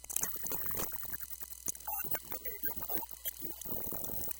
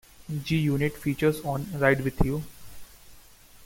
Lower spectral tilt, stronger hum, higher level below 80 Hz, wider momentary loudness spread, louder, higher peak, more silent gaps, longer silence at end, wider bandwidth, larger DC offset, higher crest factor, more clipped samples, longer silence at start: second, -2 dB/octave vs -6.5 dB/octave; neither; second, -58 dBFS vs -40 dBFS; second, 6 LU vs 11 LU; second, -36 LUFS vs -27 LUFS; second, -12 dBFS vs -8 dBFS; neither; about the same, 0 s vs 0 s; about the same, 17.5 kHz vs 17 kHz; neither; first, 26 dB vs 20 dB; neither; second, 0 s vs 0.2 s